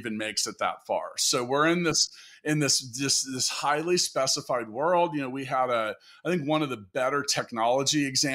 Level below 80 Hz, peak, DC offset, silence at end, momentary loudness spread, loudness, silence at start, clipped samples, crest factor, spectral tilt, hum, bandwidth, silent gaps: -68 dBFS; -12 dBFS; under 0.1%; 0 s; 7 LU; -26 LUFS; 0 s; under 0.1%; 16 dB; -2.5 dB/octave; none; 16 kHz; none